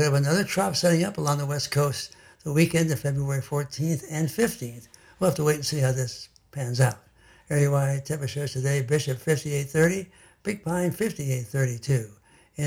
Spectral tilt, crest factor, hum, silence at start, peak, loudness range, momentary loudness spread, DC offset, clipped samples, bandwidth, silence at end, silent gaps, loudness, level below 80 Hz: -5.5 dB/octave; 18 dB; none; 0 s; -6 dBFS; 2 LU; 12 LU; under 0.1%; under 0.1%; 16.5 kHz; 0 s; none; -26 LUFS; -56 dBFS